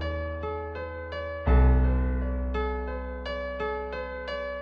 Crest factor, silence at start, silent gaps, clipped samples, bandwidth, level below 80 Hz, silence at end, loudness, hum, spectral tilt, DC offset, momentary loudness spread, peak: 16 dB; 0 s; none; under 0.1%; 5 kHz; -28 dBFS; 0 s; -29 LUFS; none; -9 dB/octave; under 0.1%; 12 LU; -10 dBFS